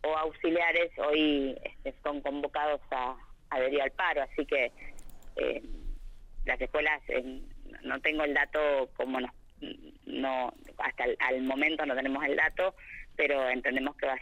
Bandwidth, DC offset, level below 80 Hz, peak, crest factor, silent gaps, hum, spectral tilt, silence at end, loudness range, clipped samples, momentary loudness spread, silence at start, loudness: 15.5 kHz; under 0.1%; -48 dBFS; -14 dBFS; 18 dB; none; none; -5 dB/octave; 0 s; 3 LU; under 0.1%; 17 LU; 0 s; -31 LUFS